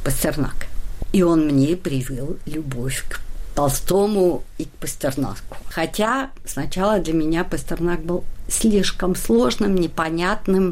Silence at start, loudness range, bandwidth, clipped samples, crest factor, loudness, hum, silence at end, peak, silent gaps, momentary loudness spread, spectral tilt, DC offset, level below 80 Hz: 0 s; 3 LU; 16 kHz; under 0.1%; 12 dB; -21 LUFS; none; 0 s; -8 dBFS; none; 12 LU; -5 dB/octave; under 0.1%; -30 dBFS